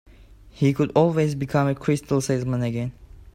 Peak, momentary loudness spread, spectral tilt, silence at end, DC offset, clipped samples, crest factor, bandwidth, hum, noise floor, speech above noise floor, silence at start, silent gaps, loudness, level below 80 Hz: -6 dBFS; 7 LU; -7 dB/octave; 0.05 s; under 0.1%; under 0.1%; 18 dB; 14.5 kHz; none; -48 dBFS; 26 dB; 0.45 s; none; -23 LUFS; -48 dBFS